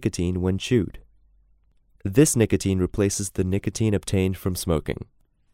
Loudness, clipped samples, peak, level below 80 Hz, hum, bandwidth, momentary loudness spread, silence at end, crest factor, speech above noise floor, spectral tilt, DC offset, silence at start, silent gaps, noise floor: -23 LUFS; under 0.1%; -4 dBFS; -44 dBFS; none; 16 kHz; 8 LU; 0.5 s; 20 dB; 38 dB; -5.5 dB/octave; under 0.1%; 0 s; none; -60 dBFS